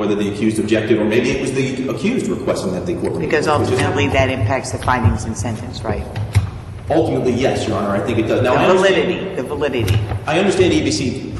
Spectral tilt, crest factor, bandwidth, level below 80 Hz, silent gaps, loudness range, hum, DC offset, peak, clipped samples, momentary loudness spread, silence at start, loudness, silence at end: -6 dB/octave; 16 dB; 12.5 kHz; -36 dBFS; none; 3 LU; none; under 0.1%; 0 dBFS; under 0.1%; 8 LU; 0 s; -17 LUFS; 0 s